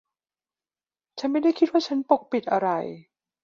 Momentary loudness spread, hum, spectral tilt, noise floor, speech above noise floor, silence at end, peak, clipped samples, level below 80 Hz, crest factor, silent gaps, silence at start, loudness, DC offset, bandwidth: 10 LU; none; -6 dB/octave; under -90 dBFS; over 67 dB; 0.45 s; -4 dBFS; under 0.1%; -74 dBFS; 22 dB; none; 1.15 s; -24 LUFS; under 0.1%; 7.2 kHz